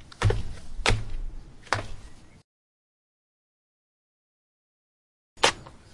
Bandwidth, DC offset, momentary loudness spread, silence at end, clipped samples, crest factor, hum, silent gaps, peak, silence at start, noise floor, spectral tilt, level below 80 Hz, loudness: 11.5 kHz; under 0.1%; 20 LU; 0.05 s; under 0.1%; 30 dB; none; 2.44-5.36 s; -2 dBFS; 0 s; under -90 dBFS; -3.5 dB/octave; -38 dBFS; -27 LUFS